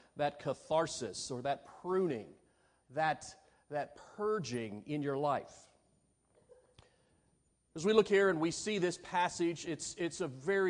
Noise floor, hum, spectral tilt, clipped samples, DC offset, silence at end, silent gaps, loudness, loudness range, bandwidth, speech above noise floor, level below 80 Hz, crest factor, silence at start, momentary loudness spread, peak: -75 dBFS; none; -4.5 dB/octave; under 0.1%; under 0.1%; 0 s; none; -36 LUFS; 6 LU; 10.5 kHz; 40 dB; -72 dBFS; 22 dB; 0.15 s; 13 LU; -14 dBFS